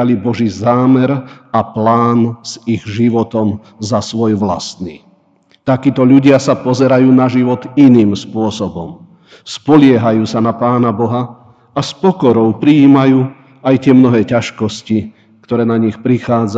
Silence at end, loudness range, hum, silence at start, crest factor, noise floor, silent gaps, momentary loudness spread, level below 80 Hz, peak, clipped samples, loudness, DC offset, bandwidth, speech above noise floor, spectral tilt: 0 s; 5 LU; none; 0 s; 12 dB; -52 dBFS; none; 13 LU; -52 dBFS; 0 dBFS; 0.3%; -12 LUFS; under 0.1%; 8 kHz; 41 dB; -7 dB/octave